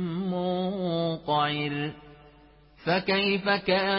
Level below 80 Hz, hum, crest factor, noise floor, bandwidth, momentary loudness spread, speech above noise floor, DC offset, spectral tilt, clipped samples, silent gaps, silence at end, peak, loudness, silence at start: -60 dBFS; none; 18 dB; -55 dBFS; 5.8 kHz; 7 LU; 29 dB; under 0.1%; -10 dB/octave; under 0.1%; none; 0 s; -10 dBFS; -27 LUFS; 0 s